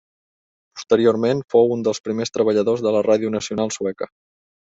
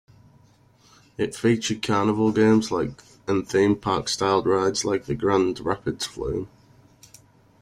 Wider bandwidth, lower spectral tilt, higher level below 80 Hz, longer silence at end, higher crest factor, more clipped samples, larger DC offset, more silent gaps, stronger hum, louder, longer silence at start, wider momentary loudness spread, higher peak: second, 8 kHz vs 14.5 kHz; about the same, -5.5 dB/octave vs -5 dB/octave; second, -62 dBFS vs -52 dBFS; second, 0.65 s vs 1.15 s; about the same, 18 dB vs 18 dB; neither; neither; first, 2.00-2.04 s vs none; neither; first, -19 LUFS vs -23 LUFS; second, 0.75 s vs 1.2 s; about the same, 12 LU vs 10 LU; first, -2 dBFS vs -8 dBFS